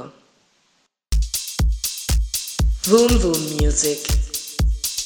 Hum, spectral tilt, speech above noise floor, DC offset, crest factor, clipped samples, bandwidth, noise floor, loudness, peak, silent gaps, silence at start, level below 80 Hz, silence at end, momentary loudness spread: none; -4 dB/octave; 48 dB; under 0.1%; 18 dB; under 0.1%; over 20 kHz; -65 dBFS; -20 LUFS; -2 dBFS; none; 0 s; -24 dBFS; 0 s; 8 LU